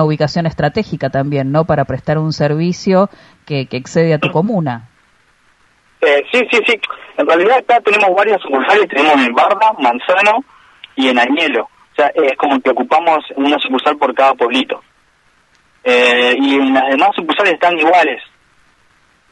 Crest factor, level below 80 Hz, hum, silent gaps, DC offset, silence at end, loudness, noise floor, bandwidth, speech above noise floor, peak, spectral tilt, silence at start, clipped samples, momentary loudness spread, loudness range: 14 dB; -50 dBFS; none; none; under 0.1%; 1.1 s; -13 LUFS; -54 dBFS; 11 kHz; 41 dB; 0 dBFS; -6 dB/octave; 0 s; under 0.1%; 8 LU; 4 LU